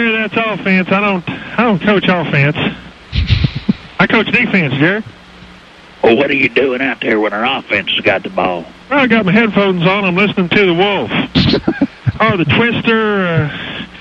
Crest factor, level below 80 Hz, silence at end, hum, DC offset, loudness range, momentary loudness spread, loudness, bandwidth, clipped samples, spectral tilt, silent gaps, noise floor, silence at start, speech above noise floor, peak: 14 dB; -34 dBFS; 0 s; none; under 0.1%; 2 LU; 9 LU; -13 LUFS; 7.4 kHz; under 0.1%; -7.5 dB/octave; none; -38 dBFS; 0 s; 26 dB; 0 dBFS